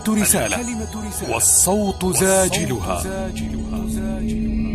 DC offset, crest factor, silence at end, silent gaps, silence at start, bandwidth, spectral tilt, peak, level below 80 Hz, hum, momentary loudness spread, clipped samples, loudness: under 0.1%; 18 dB; 0 s; none; 0 s; 14.5 kHz; -3.5 dB/octave; -2 dBFS; -32 dBFS; none; 12 LU; under 0.1%; -19 LUFS